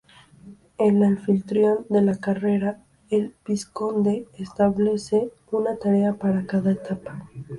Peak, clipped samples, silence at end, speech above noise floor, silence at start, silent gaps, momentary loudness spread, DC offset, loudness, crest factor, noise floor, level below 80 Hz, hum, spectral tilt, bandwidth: -8 dBFS; under 0.1%; 0 s; 26 dB; 0.45 s; none; 10 LU; under 0.1%; -23 LUFS; 14 dB; -48 dBFS; -58 dBFS; none; -8 dB/octave; 11.5 kHz